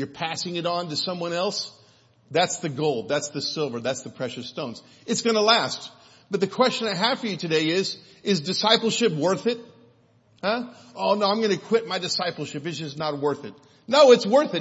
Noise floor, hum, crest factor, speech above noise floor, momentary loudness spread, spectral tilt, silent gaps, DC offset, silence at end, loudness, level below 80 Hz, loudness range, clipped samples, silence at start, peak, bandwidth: -59 dBFS; none; 20 dB; 36 dB; 13 LU; -4 dB/octave; none; under 0.1%; 0 s; -24 LUFS; -74 dBFS; 4 LU; under 0.1%; 0 s; -4 dBFS; 8 kHz